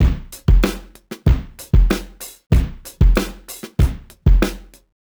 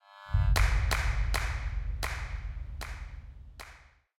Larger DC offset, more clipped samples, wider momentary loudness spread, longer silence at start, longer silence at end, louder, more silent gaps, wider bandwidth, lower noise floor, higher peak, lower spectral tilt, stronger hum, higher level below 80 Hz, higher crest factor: neither; neither; second, 17 LU vs 21 LU; about the same, 0 s vs 0.1 s; about the same, 0.45 s vs 0.4 s; first, -19 LUFS vs -32 LUFS; first, 2.46-2.50 s vs none; first, over 20 kHz vs 17 kHz; second, -36 dBFS vs -55 dBFS; first, 0 dBFS vs -12 dBFS; first, -6.5 dB/octave vs -4 dB/octave; neither; first, -18 dBFS vs -32 dBFS; about the same, 16 dB vs 18 dB